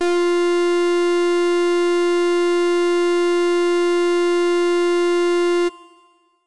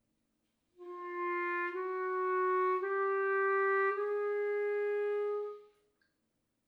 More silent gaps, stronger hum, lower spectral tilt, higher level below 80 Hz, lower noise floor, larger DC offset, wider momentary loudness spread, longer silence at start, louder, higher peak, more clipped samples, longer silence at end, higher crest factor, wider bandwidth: neither; neither; second, -2.5 dB/octave vs -4.5 dB/octave; first, -72 dBFS vs under -90 dBFS; second, -56 dBFS vs -81 dBFS; first, 1% vs under 0.1%; second, 0 LU vs 10 LU; second, 0 s vs 0.8 s; first, -18 LUFS vs -33 LUFS; first, -14 dBFS vs -22 dBFS; neither; second, 0 s vs 1.05 s; second, 4 dB vs 12 dB; first, 11.5 kHz vs 4.8 kHz